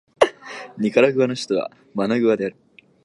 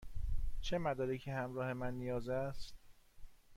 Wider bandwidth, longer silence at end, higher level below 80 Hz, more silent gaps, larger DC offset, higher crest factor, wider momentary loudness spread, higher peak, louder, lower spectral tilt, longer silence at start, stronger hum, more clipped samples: about the same, 11.5 kHz vs 11.5 kHz; first, 0.55 s vs 0 s; second, -62 dBFS vs -46 dBFS; neither; neither; first, 20 dB vs 14 dB; first, 13 LU vs 7 LU; first, 0 dBFS vs -24 dBFS; first, -21 LUFS vs -41 LUFS; about the same, -5.5 dB/octave vs -6.5 dB/octave; first, 0.2 s vs 0 s; neither; neither